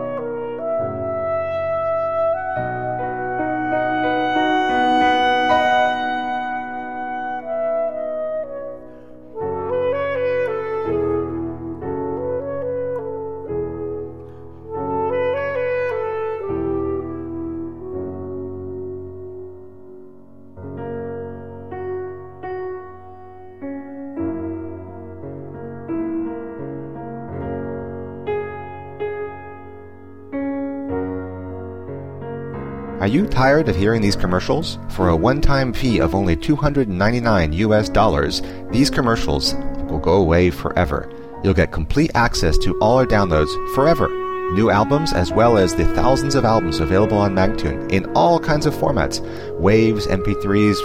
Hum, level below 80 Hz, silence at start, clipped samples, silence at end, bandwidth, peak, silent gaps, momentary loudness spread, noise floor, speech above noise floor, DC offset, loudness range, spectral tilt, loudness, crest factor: none; -32 dBFS; 0 s; under 0.1%; 0 s; 16 kHz; -4 dBFS; none; 16 LU; -44 dBFS; 28 dB; 0.7%; 13 LU; -6 dB/octave; -20 LUFS; 16 dB